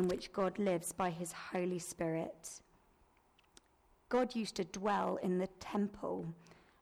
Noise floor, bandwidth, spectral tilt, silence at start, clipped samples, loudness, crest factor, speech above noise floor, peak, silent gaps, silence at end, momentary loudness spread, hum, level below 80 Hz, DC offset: -71 dBFS; 16 kHz; -5.5 dB/octave; 0 s; under 0.1%; -38 LUFS; 14 dB; 33 dB; -24 dBFS; none; 0.3 s; 10 LU; none; -68 dBFS; under 0.1%